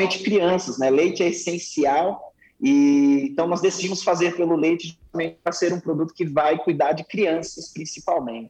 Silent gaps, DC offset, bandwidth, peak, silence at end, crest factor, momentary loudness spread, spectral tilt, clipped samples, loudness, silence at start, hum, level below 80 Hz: none; under 0.1%; 8.8 kHz; -10 dBFS; 0 s; 12 dB; 9 LU; -5 dB/octave; under 0.1%; -21 LUFS; 0 s; none; -62 dBFS